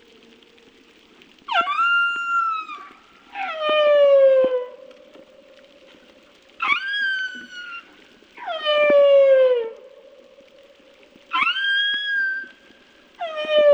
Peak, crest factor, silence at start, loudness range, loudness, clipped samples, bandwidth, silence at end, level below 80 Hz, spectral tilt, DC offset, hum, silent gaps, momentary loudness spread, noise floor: -6 dBFS; 16 dB; 1.5 s; 8 LU; -19 LUFS; under 0.1%; 7.4 kHz; 0 s; -70 dBFS; -2 dB/octave; under 0.1%; none; none; 21 LU; -52 dBFS